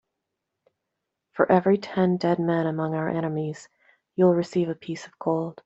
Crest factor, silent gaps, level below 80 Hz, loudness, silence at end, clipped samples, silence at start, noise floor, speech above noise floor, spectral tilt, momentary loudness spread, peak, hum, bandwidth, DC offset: 22 dB; none; -68 dBFS; -24 LUFS; 0.15 s; under 0.1%; 1.35 s; -82 dBFS; 59 dB; -8 dB/octave; 13 LU; -4 dBFS; none; 8 kHz; under 0.1%